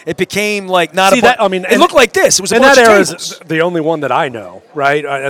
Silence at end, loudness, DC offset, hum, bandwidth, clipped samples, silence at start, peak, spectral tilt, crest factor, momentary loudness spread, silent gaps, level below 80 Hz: 0 s; -10 LUFS; under 0.1%; none; over 20 kHz; 0.6%; 0.05 s; 0 dBFS; -3 dB/octave; 12 dB; 10 LU; none; -46 dBFS